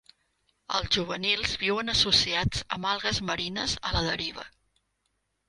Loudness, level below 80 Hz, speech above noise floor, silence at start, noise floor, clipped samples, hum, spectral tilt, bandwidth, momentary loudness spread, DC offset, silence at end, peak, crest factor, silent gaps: -26 LUFS; -46 dBFS; 49 dB; 0.7 s; -77 dBFS; under 0.1%; none; -3 dB/octave; 11.5 kHz; 10 LU; under 0.1%; 1 s; -8 dBFS; 22 dB; none